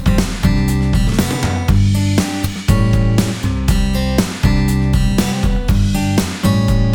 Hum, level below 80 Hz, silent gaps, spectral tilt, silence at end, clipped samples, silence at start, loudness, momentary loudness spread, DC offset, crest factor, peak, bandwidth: none; -20 dBFS; none; -6 dB/octave; 0 s; under 0.1%; 0 s; -16 LUFS; 3 LU; 0.2%; 12 dB; 0 dBFS; over 20 kHz